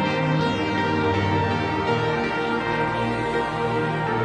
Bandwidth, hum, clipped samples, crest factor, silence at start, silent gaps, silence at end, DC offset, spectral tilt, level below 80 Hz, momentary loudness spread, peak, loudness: 10.5 kHz; none; under 0.1%; 12 dB; 0 s; none; 0 s; under 0.1%; -6.5 dB/octave; -46 dBFS; 2 LU; -10 dBFS; -23 LUFS